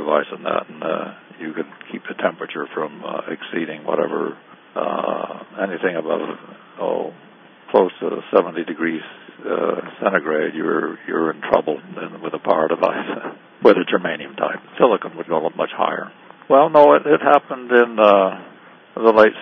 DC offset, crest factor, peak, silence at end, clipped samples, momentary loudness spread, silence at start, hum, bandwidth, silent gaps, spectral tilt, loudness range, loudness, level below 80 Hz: under 0.1%; 20 dB; 0 dBFS; 0 s; under 0.1%; 17 LU; 0 s; none; 6 kHz; none; -7.5 dB/octave; 10 LU; -19 LUFS; -66 dBFS